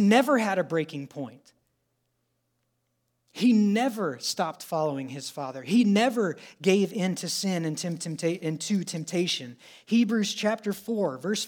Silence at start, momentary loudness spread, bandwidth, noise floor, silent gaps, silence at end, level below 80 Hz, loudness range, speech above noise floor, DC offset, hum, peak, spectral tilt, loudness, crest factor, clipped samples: 0 s; 13 LU; 19 kHz; -76 dBFS; none; 0 s; -82 dBFS; 3 LU; 50 dB; under 0.1%; none; -6 dBFS; -5 dB/octave; -27 LUFS; 20 dB; under 0.1%